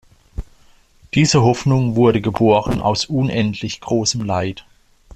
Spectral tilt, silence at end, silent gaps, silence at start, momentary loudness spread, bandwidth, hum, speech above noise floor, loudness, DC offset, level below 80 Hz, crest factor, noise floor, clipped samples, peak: -5.5 dB/octave; 0.55 s; none; 0.35 s; 20 LU; 9.6 kHz; none; 34 dB; -17 LUFS; under 0.1%; -40 dBFS; 16 dB; -50 dBFS; under 0.1%; -2 dBFS